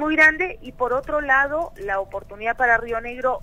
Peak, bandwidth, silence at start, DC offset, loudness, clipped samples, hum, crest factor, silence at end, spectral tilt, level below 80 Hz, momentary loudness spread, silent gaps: -2 dBFS; 15.5 kHz; 0 s; under 0.1%; -21 LUFS; under 0.1%; none; 18 dB; 0 s; -5 dB/octave; -44 dBFS; 12 LU; none